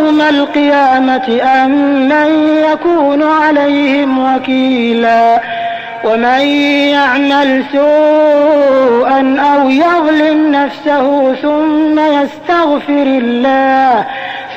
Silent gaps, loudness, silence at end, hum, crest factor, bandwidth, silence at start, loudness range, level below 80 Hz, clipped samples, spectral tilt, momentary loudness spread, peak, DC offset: none; -10 LUFS; 0 s; none; 8 dB; 7.8 kHz; 0 s; 2 LU; -52 dBFS; under 0.1%; -5 dB/octave; 4 LU; -2 dBFS; under 0.1%